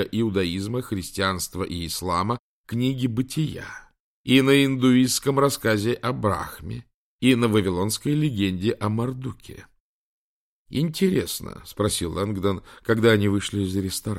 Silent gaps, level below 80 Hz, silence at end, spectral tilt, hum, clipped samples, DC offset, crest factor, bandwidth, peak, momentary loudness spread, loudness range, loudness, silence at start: 2.39-2.64 s, 4.00-4.24 s, 6.94-7.19 s, 9.80-10.65 s; -50 dBFS; 0 s; -5 dB/octave; none; under 0.1%; under 0.1%; 20 dB; 16.5 kHz; -4 dBFS; 13 LU; 6 LU; -23 LUFS; 0 s